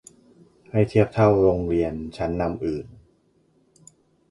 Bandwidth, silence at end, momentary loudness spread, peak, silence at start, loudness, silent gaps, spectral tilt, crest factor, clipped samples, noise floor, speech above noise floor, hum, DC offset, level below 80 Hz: 11.5 kHz; 1.45 s; 12 LU; -4 dBFS; 0.75 s; -22 LUFS; none; -8.5 dB/octave; 20 dB; under 0.1%; -63 dBFS; 42 dB; none; under 0.1%; -44 dBFS